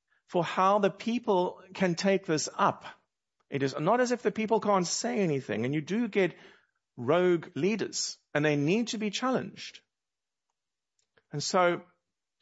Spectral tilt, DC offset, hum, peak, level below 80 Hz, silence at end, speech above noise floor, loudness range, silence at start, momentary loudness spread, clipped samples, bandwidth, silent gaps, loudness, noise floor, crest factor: -4.5 dB/octave; under 0.1%; none; -10 dBFS; -78 dBFS; 0.6 s; over 62 dB; 4 LU; 0.3 s; 9 LU; under 0.1%; 8 kHz; none; -29 LUFS; under -90 dBFS; 20 dB